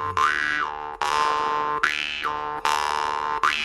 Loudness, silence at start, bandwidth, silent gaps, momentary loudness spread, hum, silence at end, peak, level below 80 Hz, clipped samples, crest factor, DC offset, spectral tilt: -24 LUFS; 0 s; 14.5 kHz; none; 5 LU; none; 0 s; -2 dBFS; -54 dBFS; under 0.1%; 22 dB; under 0.1%; -1.5 dB/octave